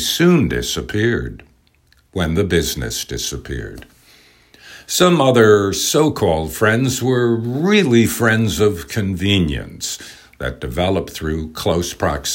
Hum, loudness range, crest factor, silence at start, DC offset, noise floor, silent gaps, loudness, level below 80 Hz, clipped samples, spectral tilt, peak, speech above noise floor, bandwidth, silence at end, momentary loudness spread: none; 7 LU; 18 dB; 0 s; under 0.1%; -56 dBFS; none; -17 LUFS; -38 dBFS; under 0.1%; -4.5 dB/octave; 0 dBFS; 39 dB; 16.5 kHz; 0 s; 13 LU